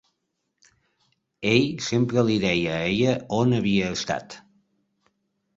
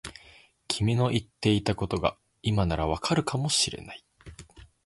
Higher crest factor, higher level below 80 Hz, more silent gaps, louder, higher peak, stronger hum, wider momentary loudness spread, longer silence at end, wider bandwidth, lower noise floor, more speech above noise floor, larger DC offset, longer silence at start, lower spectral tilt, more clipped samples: about the same, 22 dB vs 22 dB; second, -54 dBFS vs -44 dBFS; neither; first, -23 LUFS vs -27 LUFS; about the same, -4 dBFS vs -6 dBFS; neither; second, 8 LU vs 17 LU; first, 1.15 s vs 0.25 s; second, 7.8 kHz vs 11.5 kHz; first, -77 dBFS vs -56 dBFS; first, 55 dB vs 29 dB; neither; first, 1.4 s vs 0.05 s; about the same, -5.5 dB/octave vs -4.5 dB/octave; neither